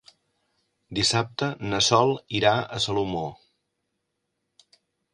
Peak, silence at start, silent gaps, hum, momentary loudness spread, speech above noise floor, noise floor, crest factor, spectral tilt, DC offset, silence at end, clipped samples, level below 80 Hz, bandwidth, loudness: -4 dBFS; 0.9 s; none; none; 11 LU; 55 dB; -79 dBFS; 24 dB; -3.5 dB/octave; under 0.1%; 1.8 s; under 0.1%; -56 dBFS; 11 kHz; -24 LUFS